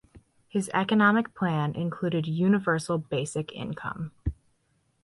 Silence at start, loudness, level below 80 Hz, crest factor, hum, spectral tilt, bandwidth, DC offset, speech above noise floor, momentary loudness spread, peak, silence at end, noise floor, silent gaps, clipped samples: 0.15 s; -27 LUFS; -48 dBFS; 18 dB; none; -6 dB/octave; 11.5 kHz; under 0.1%; 44 dB; 13 LU; -10 dBFS; 0.7 s; -71 dBFS; none; under 0.1%